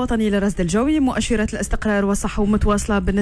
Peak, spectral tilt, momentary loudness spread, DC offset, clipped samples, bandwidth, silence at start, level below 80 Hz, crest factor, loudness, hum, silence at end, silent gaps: -6 dBFS; -5.5 dB/octave; 3 LU; under 0.1%; under 0.1%; 11 kHz; 0 s; -28 dBFS; 12 dB; -20 LUFS; none; 0 s; none